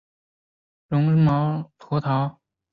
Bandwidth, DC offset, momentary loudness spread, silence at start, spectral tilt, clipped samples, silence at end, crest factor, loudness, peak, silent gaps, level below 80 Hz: 4.9 kHz; under 0.1%; 10 LU; 0.9 s; -10.5 dB/octave; under 0.1%; 0.4 s; 14 dB; -23 LUFS; -10 dBFS; none; -56 dBFS